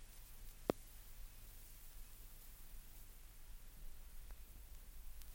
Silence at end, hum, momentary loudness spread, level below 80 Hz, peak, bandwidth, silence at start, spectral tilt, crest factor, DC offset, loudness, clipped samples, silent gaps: 0 s; none; 15 LU; -56 dBFS; -18 dBFS; 17 kHz; 0 s; -4.5 dB/octave; 34 dB; under 0.1%; -55 LUFS; under 0.1%; none